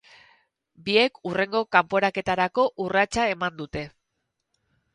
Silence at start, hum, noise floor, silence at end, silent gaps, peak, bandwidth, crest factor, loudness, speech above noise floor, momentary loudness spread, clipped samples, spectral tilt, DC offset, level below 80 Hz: 0.8 s; none; -79 dBFS; 1.05 s; none; -2 dBFS; 11.5 kHz; 22 dB; -24 LUFS; 55 dB; 13 LU; under 0.1%; -4.5 dB/octave; under 0.1%; -56 dBFS